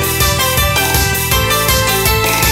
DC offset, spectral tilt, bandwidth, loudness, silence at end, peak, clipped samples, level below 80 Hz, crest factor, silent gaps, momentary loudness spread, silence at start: under 0.1%; -2.5 dB/octave; 16.5 kHz; -12 LUFS; 0 s; -2 dBFS; under 0.1%; -22 dBFS; 10 dB; none; 1 LU; 0 s